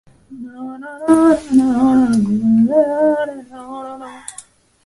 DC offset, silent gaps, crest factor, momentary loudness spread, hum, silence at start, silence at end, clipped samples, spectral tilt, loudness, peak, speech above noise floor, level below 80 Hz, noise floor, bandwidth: under 0.1%; none; 16 dB; 20 LU; none; 0.3 s; 0.45 s; under 0.1%; -7 dB/octave; -14 LUFS; 0 dBFS; 28 dB; -50 dBFS; -42 dBFS; 11.5 kHz